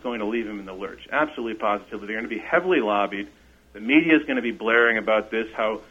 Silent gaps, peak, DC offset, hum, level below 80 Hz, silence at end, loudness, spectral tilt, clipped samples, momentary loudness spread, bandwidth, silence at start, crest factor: none; -4 dBFS; under 0.1%; none; -56 dBFS; 0.05 s; -23 LUFS; -6 dB/octave; under 0.1%; 15 LU; 7.4 kHz; 0.05 s; 20 dB